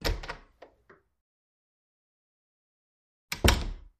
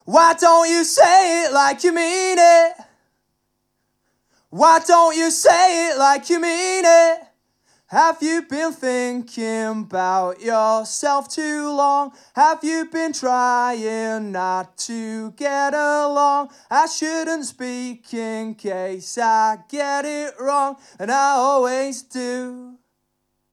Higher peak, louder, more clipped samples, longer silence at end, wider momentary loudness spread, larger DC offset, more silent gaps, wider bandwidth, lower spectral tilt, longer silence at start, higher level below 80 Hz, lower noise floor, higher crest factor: second, -6 dBFS vs -2 dBFS; second, -28 LUFS vs -18 LUFS; neither; second, 0.2 s vs 0.8 s; first, 18 LU vs 15 LU; neither; first, 1.21-3.28 s vs none; about the same, 14 kHz vs 14.5 kHz; first, -4 dB/octave vs -2 dB/octave; about the same, 0 s vs 0.05 s; first, -38 dBFS vs -80 dBFS; second, -62 dBFS vs -72 dBFS; first, 28 dB vs 18 dB